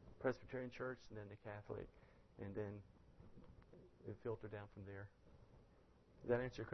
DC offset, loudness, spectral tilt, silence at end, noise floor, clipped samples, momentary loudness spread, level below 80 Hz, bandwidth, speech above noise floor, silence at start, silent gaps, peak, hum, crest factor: under 0.1%; -50 LUFS; -6.5 dB/octave; 0 s; -70 dBFS; under 0.1%; 24 LU; -70 dBFS; 6.2 kHz; 22 dB; 0 s; none; -26 dBFS; none; 24 dB